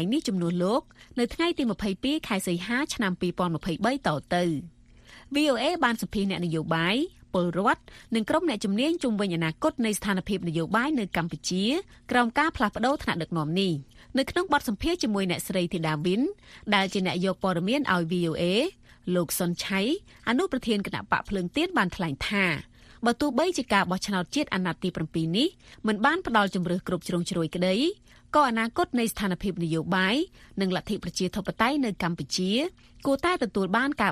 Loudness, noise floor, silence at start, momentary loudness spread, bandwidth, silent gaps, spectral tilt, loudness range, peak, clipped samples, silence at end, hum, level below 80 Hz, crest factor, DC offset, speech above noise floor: -27 LUFS; -52 dBFS; 0 s; 6 LU; 15 kHz; none; -5 dB/octave; 1 LU; -6 dBFS; under 0.1%; 0 s; none; -52 dBFS; 20 dB; under 0.1%; 25 dB